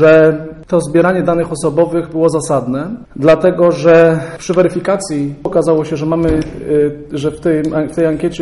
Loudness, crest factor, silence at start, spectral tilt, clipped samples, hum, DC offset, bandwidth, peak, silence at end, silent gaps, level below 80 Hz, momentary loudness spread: -13 LUFS; 12 dB; 0 s; -6.5 dB/octave; under 0.1%; none; under 0.1%; 11.5 kHz; 0 dBFS; 0 s; none; -38 dBFS; 10 LU